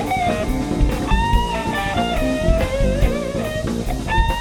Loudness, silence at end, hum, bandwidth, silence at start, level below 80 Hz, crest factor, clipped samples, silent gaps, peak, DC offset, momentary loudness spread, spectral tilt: -20 LUFS; 0 s; none; 17 kHz; 0 s; -22 dBFS; 18 dB; under 0.1%; none; -2 dBFS; under 0.1%; 4 LU; -6 dB/octave